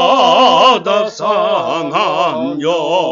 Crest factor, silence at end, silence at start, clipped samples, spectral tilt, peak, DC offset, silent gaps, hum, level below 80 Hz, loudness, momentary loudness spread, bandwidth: 12 dB; 0 s; 0 s; under 0.1%; -3.5 dB/octave; 0 dBFS; under 0.1%; none; none; -58 dBFS; -12 LUFS; 8 LU; 7.6 kHz